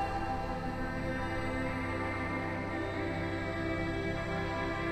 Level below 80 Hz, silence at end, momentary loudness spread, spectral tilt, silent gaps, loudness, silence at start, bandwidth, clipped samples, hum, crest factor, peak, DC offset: -46 dBFS; 0 s; 2 LU; -6.5 dB/octave; none; -35 LUFS; 0 s; 13.5 kHz; under 0.1%; none; 12 dB; -22 dBFS; under 0.1%